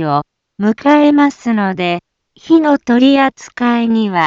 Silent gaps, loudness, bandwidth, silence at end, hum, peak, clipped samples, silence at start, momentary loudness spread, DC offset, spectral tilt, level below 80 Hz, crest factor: none; -13 LUFS; 7.6 kHz; 0 s; none; 0 dBFS; under 0.1%; 0 s; 9 LU; under 0.1%; -6.5 dB/octave; -56 dBFS; 12 dB